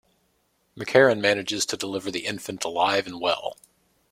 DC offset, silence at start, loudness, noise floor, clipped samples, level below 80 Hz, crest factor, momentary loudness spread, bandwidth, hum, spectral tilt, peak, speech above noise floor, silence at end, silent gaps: under 0.1%; 0.75 s; -24 LUFS; -69 dBFS; under 0.1%; -64 dBFS; 22 dB; 12 LU; 16 kHz; none; -3 dB/octave; -4 dBFS; 45 dB; 0.6 s; none